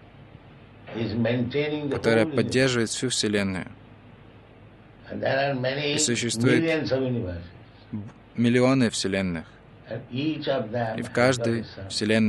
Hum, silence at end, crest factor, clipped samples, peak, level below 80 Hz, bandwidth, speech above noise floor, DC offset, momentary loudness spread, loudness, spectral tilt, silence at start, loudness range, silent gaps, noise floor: none; 0 s; 20 dB; under 0.1%; -6 dBFS; -56 dBFS; 12 kHz; 25 dB; under 0.1%; 16 LU; -25 LUFS; -4.5 dB/octave; 0.15 s; 3 LU; none; -49 dBFS